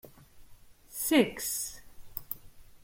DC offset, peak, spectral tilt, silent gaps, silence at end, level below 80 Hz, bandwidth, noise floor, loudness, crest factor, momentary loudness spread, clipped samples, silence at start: under 0.1%; -10 dBFS; -3 dB/octave; none; 0.05 s; -58 dBFS; 16.5 kHz; -53 dBFS; -30 LUFS; 24 dB; 18 LU; under 0.1%; 0.05 s